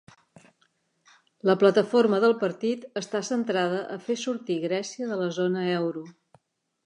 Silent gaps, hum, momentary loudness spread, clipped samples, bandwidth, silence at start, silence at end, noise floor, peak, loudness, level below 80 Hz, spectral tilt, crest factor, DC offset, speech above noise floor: none; none; 11 LU; under 0.1%; 10 kHz; 1.45 s; 0.75 s; -70 dBFS; -6 dBFS; -26 LUFS; -80 dBFS; -5.5 dB/octave; 20 dB; under 0.1%; 45 dB